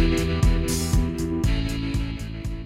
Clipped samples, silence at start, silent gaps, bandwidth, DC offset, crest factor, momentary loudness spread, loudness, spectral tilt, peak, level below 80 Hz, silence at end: under 0.1%; 0 s; none; 16.5 kHz; under 0.1%; 14 dB; 8 LU; -25 LUFS; -5.5 dB/octave; -8 dBFS; -26 dBFS; 0 s